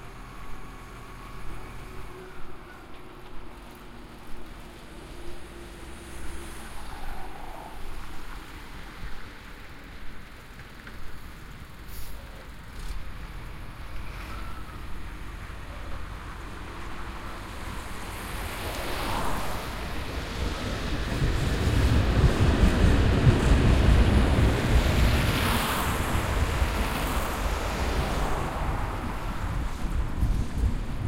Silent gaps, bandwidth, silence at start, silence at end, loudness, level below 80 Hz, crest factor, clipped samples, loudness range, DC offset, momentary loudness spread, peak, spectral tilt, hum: none; 16 kHz; 0 s; 0 s; -27 LUFS; -30 dBFS; 20 dB; under 0.1%; 21 LU; under 0.1%; 22 LU; -6 dBFS; -5.5 dB/octave; none